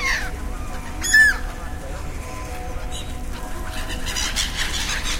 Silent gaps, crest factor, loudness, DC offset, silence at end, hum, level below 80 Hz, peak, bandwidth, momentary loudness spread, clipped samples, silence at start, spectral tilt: none; 20 dB; -22 LUFS; under 0.1%; 0 s; none; -30 dBFS; -4 dBFS; 16 kHz; 18 LU; under 0.1%; 0 s; -1.5 dB/octave